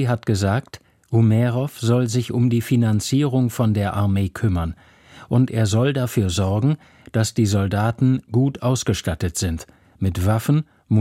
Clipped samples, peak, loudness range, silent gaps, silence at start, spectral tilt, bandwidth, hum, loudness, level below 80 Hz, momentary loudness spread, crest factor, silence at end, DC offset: under 0.1%; -6 dBFS; 2 LU; none; 0 s; -6.5 dB/octave; 16 kHz; none; -21 LUFS; -42 dBFS; 5 LU; 14 dB; 0 s; under 0.1%